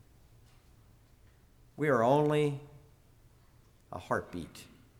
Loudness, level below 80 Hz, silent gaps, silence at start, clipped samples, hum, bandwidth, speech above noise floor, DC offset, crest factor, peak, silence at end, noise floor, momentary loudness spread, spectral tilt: -31 LUFS; -64 dBFS; none; 1.8 s; under 0.1%; none; 16.5 kHz; 32 dB; under 0.1%; 20 dB; -14 dBFS; 0.35 s; -62 dBFS; 21 LU; -7 dB/octave